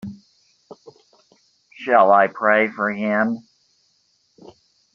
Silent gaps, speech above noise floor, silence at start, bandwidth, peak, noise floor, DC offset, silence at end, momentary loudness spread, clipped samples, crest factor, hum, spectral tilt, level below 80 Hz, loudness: none; 47 dB; 0.05 s; 7 kHz; -2 dBFS; -64 dBFS; under 0.1%; 1.55 s; 18 LU; under 0.1%; 20 dB; none; -4 dB/octave; -68 dBFS; -18 LUFS